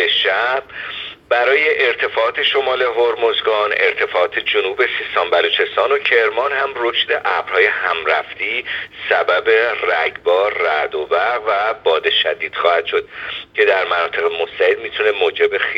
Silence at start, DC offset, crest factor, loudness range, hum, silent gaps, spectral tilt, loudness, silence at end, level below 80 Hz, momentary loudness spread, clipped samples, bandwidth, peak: 0 s; under 0.1%; 16 dB; 1 LU; none; none; -3.5 dB/octave; -16 LUFS; 0 s; -58 dBFS; 6 LU; under 0.1%; 7.4 kHz; 0 dBFS